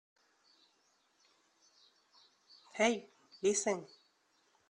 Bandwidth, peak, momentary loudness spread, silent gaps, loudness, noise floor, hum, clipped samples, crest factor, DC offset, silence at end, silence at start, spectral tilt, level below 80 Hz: 11 kHz; -18 dBFS; 15 LU; none; -35 LUFS; -75 dBFS; none; under 0.1%; 24 dB; under 0.1%; 0.85 s; 2.75 s; -2.5 dB/octave; -82 dBFS